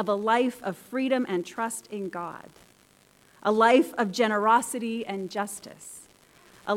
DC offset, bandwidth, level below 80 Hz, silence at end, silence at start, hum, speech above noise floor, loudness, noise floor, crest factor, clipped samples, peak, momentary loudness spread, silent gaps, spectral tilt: under 0.1%; 16.5 kHz; -74 dBFS; 0 s; 0 s; none; 33 dB; -26 LUFS; -60 dBFS; 20 dB; under 0.1%; -8 dBFS; 19 LU; none; -4 dB/octave